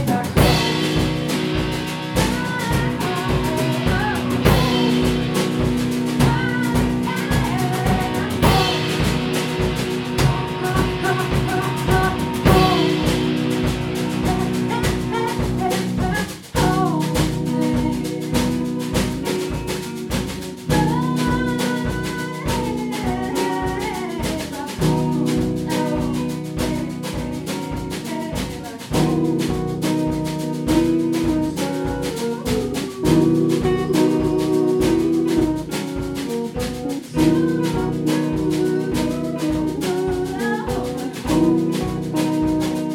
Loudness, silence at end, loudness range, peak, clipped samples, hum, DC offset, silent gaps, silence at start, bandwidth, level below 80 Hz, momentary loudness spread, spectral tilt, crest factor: -20 LUFS; 0 s; 4 LU; -2 dBFS; under 0.1%; none; under 0.1%; none; 0 s; 19 kHz; -34 dBFS; 8 LU; -5.5 dB/octave; 18 dB